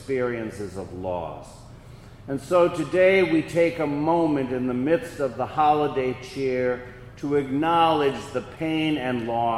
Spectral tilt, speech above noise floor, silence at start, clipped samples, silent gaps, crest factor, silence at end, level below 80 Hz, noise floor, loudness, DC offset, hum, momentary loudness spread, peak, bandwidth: -6.5 dB/octave; 21 dB; 0 s; under 0.1%; none; 18 dB; 0 s; -52 dBFS; -44 dBFS; -24 LUFS; under 0.1%; none; 13 LU; -6 dBFS; 13 kHz